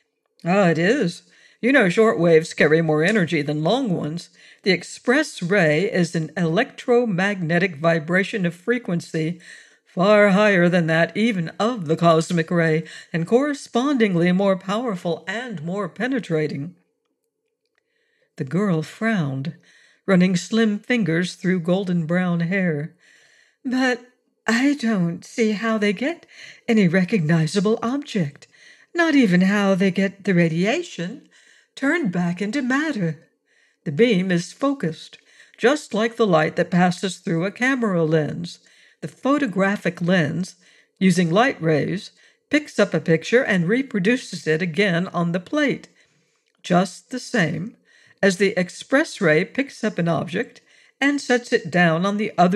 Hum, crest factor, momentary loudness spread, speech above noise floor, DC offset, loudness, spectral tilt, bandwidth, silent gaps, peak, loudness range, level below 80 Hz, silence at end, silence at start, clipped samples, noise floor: none; 18 dB; 11 LU; 55 dB; under 0.1%; -20 LUFS; -6 dB/octave; 12 kHz; none; -4 dBFS; 5 LU; -70 dBFS; 0 s; 0.45 s; under 0.1%; -76 dBFS